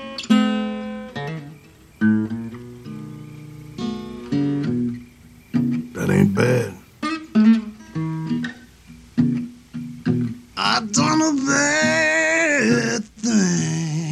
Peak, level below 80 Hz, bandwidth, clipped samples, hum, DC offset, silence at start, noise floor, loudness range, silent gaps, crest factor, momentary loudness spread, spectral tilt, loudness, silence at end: -4 dBFS; -54 dBFS; 12.5 kHz; under 0.1%; none; under 0.1%; 0 s; -46 dBFS; 9 LU; none; 18 dB; 18 LU; -4.5 dB/octave; -20 LUFS; 0 s